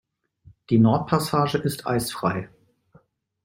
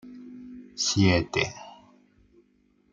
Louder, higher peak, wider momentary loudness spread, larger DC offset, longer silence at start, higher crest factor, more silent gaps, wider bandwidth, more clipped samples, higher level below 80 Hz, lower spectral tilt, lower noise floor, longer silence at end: about the same, -23 LUFS vs -25 LUFS; first, -4 dBFS vs -8 dBFS; second, 8 LU vs 23 LU; neither; first, 0.7 s vs 0.05 s; about the same, 20 dB vs 20 dB; neither; first, 16.5 kHz vs 9.2 kHz; neither; about the same, -56 dBFS vs -56 dBFS; first, -6 dB/octave vs -4 dB/octave; second, -59 dBFS vs -65 dBFS; second, 1 s vs 1.2 s